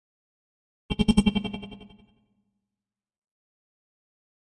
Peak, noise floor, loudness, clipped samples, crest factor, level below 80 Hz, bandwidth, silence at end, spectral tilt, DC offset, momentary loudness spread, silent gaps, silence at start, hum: -6 dBFS; under -90 dBFS; -25 LUFS; under 0.1%; 26 dB; -42 dBFS; 11 kHz; 2.7 s; -6 dB/octave; under 0.1%; 18 LU; none; 0.9 s; none